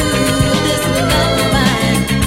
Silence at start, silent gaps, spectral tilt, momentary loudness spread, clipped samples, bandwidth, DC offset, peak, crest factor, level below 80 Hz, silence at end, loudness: 0 s; none; -4.5 dB/octave; 2 LU; under 0.1%; 16.5 kHz; under 0.1%; 0 dBFS; 12 dB; -28 dBFS; 0 s; -13 LUFS